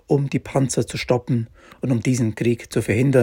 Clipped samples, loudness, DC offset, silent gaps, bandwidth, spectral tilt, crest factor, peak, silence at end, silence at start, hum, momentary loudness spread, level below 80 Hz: under 0.1%; -22 LUFS; under 0.1%; none; 16.5 kHz; -6.5 dB/octave; 16 dB; -4 dBFS; 0 s; 0.1 s; none; 5 LU; -50 dBFS